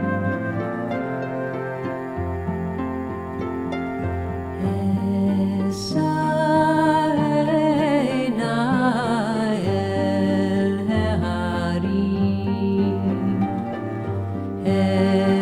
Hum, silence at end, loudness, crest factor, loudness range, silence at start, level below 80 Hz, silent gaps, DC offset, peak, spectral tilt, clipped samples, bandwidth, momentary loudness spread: none; 0 s; -22 LUFS; 14 dB; 7 LU; 0 s; -46 dBFS; none; under 0.1%; -6 dBFS; -7.5 dB/octave; under 0.1%; 11 kHz; 9 LU